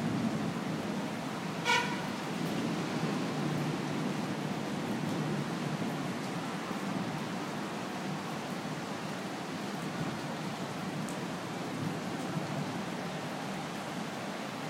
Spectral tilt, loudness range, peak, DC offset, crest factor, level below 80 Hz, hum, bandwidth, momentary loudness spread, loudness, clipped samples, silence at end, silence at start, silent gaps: -5 dB/octave; 4 LU; -16 dBFS; under 0.1%; 20 dB; -70 dBFS; none; 16 kHz; 4 LU; -36 LUFS; under 0.1%; 0 s; 0 s; none